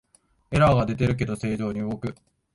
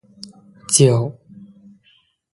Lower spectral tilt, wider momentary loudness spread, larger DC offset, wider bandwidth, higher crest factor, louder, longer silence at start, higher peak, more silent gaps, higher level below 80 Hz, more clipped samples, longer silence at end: first, -7.5 dB/octave vs -4.5 dB/octave; second, 11 LU vs 26 LU; neither; about the same, 11.5 kHz vs 11.5 kHz; about the same, 18 dB vs 20 dB; second, -24 LUFS vs -16 LUFS; second, 0.5 s vs 0.7 s; second, -6 dBFS vs 0 dBFS; neither; first, -44 dBFS vs -58 dBFS; neither; second, 0.4 s vs 1.25 s